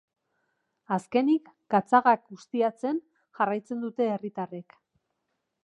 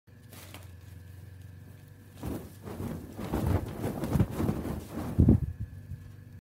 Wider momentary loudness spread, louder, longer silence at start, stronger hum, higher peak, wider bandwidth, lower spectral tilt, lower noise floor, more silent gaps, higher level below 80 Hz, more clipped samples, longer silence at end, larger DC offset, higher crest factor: second, 13 LU vs 23 LU; first, -27 LUFS vs -31 LUFS; first, 0.9 s vs 0.15 s; neither; about the same, -6 dBFS vs -8 dBFS; second, 11 kHz vs 16 kHz; about the same, -7 dB/octave vs -8 dB/octave; first, -80 dBFS vs -50 dBFS; neither; second, -82 dBFS vs -40 dBFS; neither; first, 1 s vs 0.1 s; neither; about the same, 22 dB vs 24 dB